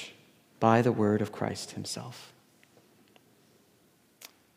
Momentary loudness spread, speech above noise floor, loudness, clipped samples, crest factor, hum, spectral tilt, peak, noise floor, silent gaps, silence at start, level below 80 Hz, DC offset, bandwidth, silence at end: 27 LU; 37 dB; -29 LUFS; under 0.1%; 24 dB; none; -6 dB/octave; -8 dBFS; -65 dBFS; none; 0 s; -76 dBFS; under 0.1%; 16 kHz; 0.3 s